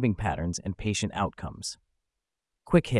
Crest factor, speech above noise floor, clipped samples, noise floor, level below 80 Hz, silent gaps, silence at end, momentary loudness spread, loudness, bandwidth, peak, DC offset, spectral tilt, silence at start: 22 dB; 58 dB; under 0.1%; -86 dBFS; -48 dBFS; none; 0 s; 12 LU; -30 LUFS; 12 kHz; -8 dBFS; under 0.1%; -5.5 dB/octave; 0 s